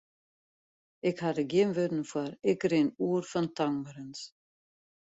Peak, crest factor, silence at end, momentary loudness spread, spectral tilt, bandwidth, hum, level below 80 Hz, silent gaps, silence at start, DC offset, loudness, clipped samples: -14 dBFS; 18 dB; 0.8 s; 15 LU; -6.5 dB/octave; 8 kHz; none; -72 dBFS; none; 1.05 s; under 0.1%; -30 LUFS; under 0.1%